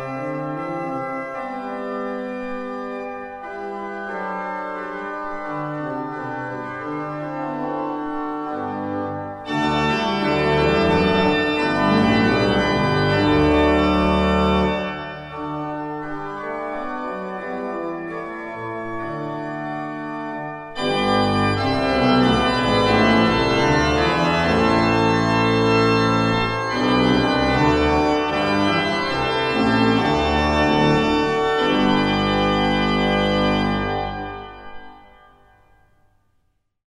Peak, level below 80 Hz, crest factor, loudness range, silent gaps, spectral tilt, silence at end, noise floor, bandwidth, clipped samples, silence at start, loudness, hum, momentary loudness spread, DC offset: -4 dBFS; -38 dBFS; 16 dB; 11 LU; none; -6 dB/octave; 1.9 s; -66 dBFS; 11.5 kHz; under 0.1%; 0 s; -20 LUFS; none; 12 LU; under 0.1%